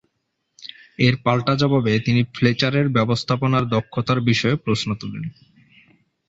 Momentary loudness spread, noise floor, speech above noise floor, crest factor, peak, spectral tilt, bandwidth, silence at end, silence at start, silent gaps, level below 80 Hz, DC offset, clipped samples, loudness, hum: 15 LU; -74 dBFS; 54 dB; 18 dB; -2 dBFS; -6.5 dB/octave; 8 kHz; 1 s; 0.6 s; none; -52 dBFS; under 0.1%; under 0.1%; -20 LUFS; none